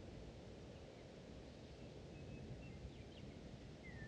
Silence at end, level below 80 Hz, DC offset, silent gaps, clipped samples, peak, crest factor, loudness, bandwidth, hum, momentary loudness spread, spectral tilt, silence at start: 0 s; -62 dBFS; under 0.1%; none; under 0.1%; -40 dBFS; 14 dB; -56 LUFS; 10 kHz; none; 3 LU; -6 dB/octave; 0 s